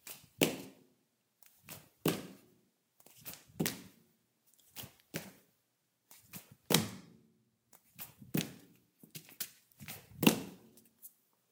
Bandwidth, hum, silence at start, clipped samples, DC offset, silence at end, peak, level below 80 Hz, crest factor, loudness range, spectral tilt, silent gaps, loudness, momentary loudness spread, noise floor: 18 kHz; none; 0.05 s; under 0.1%; under 0.1%; 0.45 s; -2 dBFS; -76 dBFS; 40 dB; 7 LU; -3.5 dB/octave; none; -37 LUFS; 24 LU; -80 dBFS